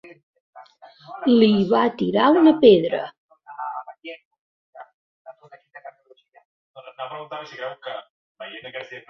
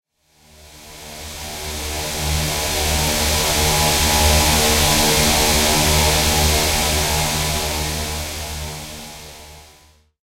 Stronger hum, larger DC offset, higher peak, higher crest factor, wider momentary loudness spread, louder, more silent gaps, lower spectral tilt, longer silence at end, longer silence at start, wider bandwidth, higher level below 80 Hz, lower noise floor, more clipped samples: neither; neither; about the same, -2 dBFS vs -2 dBFS; about the same, 20 dB vs 18 dB; first, 25 LU vs 17 LU; about the same, -18 LUFS vs -16 LUFS; first, 3.18-3.29 s, 4.25-4.31 s, 4.39-4.73 s, 4.94-5.25 s, 6.45-6.74 s, 8.10-8.35 s vs none; first, -8 dB/octave vs -2.5 dB/octave; second, 0.1 s vs 0.6 s; about the same, 0.55 s vs 0.65 s; second, 6 kHz vs 16 kHz; second, -64 dBFS vs -26 dBFS; about the same, -55 dBFS vs -54 dBFS; neither